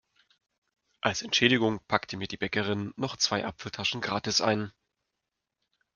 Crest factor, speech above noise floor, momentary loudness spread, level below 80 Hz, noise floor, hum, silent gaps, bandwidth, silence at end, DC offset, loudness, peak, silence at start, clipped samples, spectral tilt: 26 dB; 56 dB; 10 LU; -66 dBFS; -85 dBFS; none; none; 11 kHz; 1.25 s; under 0.1%; -28 LUFS; -6 dBFS; 1.05 s; under 0.1%; -3.5 dB/octave